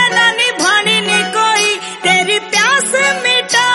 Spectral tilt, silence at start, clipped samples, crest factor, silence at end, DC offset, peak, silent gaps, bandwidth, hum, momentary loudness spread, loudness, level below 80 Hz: -1 dB/octave; 0 s; under 0.1%; 12 dB; 0 s; under 0.1%; 0 dBFS; none; 11.5 kHz; none; 3 LU; -11 LUFS; -60 dBFS